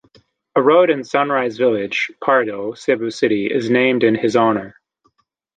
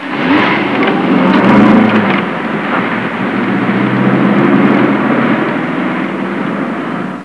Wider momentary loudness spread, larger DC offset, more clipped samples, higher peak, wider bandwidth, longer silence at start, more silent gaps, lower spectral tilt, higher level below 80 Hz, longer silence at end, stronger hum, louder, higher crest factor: about the same, 7 LU vs 9 LU; second, under 0.1% vs 0.3%; second, under 0.1% vs 0.3%; about the same, -2 dBFS vs 0 dBFS; about the same, 9.2 kHz vs 9.6 kHz; first, 0.55 s vs 0 s; neither; second, -5.5 dB/octave vs -8 dB/octave; second, -64 dBFS vs -50 dBFS; first, 0.85 s vs 0 s; neither; second, -17 LUFS vs -11 LUFS; about the same, 16 dB vs 12 dB